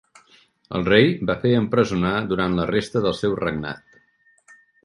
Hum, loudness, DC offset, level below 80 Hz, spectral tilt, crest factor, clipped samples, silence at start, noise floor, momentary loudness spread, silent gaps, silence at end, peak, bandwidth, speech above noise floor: none; -21 LUFS; under 0.1%; -48 dBFS; -6.5 dB/octave; 20 dB; under 0.1%; 0.7 s; -60 dBFS; 12 LU; none; 1.1 s; -2 dBFS; 11.5 kHz; 40 dB